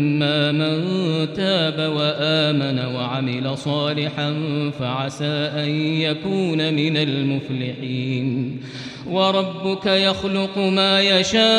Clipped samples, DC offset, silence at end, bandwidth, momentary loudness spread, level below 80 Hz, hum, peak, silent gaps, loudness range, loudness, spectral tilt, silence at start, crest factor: under 0.1%; under 0.1%; 0 s; 10 kHz; 8 LU; -58 dBFS; none; -4 dBFS; none; 3 LU; -20 LUFS; -5.5 dB/octave; 0 s; 16 dB